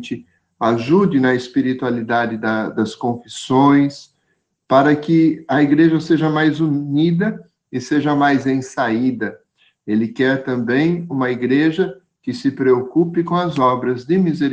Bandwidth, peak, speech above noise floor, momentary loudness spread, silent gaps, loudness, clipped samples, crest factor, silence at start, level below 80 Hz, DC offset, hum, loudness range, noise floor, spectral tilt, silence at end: 9.2 kHz; -2 dBFS; 52 dB; 9 LU; none; -17 LUFS; under 0.1%; 16 dB; 0 s; -60 dBFS; under 0.1%; none; 3 LU; -68 dBFS; -7 dB/octave; 0 s